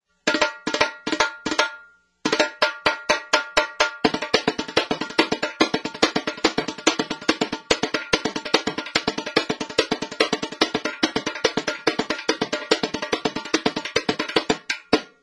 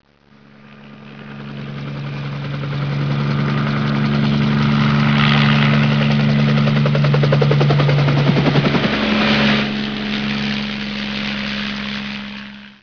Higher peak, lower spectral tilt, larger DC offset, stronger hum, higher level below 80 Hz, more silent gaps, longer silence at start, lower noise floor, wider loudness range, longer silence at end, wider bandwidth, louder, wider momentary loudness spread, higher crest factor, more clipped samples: about the same, 0 dBFS vs -2 dBFS; second, -2.5 dB/octave vs -7 dB/octave; second, under 0.1% vs 0.5%; neither; second, -54 dBFS vs -42 dBFS; neither; second, 0.25 s vs 0.65 s; about the same, -49 dBFS vs -48 dBFS; second, 2 LU vs 8 LU; about the same, 0.15 s vs 0.1 s; first, 11 kHz vs 5.4 kHz; second, -23 LUFS vs -16 LUFS; second, 3 LU vs 14 LU; first, 24 dB vs 14 dB; neither